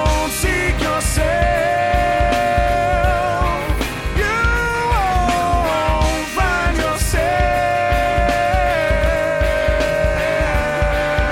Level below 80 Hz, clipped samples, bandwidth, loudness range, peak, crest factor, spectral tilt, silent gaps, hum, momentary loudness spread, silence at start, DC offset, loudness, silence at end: -22 dBFS; under 0.1%; 16.5 kHz; 1 LU; -2 dBFS; 14 dB; -4.5 dB/octave; none; none; 2 LU; 0 s; under 0.1%; -17 LUFS; 0 s